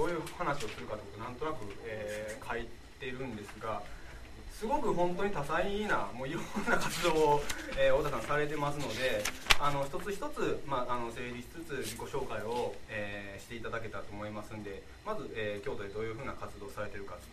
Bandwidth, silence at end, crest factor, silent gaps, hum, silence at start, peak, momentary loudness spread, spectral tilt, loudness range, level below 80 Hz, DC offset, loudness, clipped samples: 14 kHz; 0 s; 34 dB; none; none; 0 s; 0 dBFS; 14 LU; -4 dB/octave; 9 LU; -48 dBFS; under 0.1%; -35 LUFS; under 0.1%